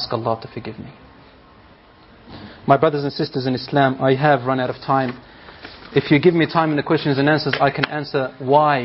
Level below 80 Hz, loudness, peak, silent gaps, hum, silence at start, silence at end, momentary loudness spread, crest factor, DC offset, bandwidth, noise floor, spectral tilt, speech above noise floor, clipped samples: -54 dBFS; -19 LUFS; 0 dBFS; none; none; 0 s; 0 s; 21 LU; 20 dB; under 0.1%; 5.8 kHz; -48 dBFS; -4.5 dB/octave; 30 dB; under 0.1%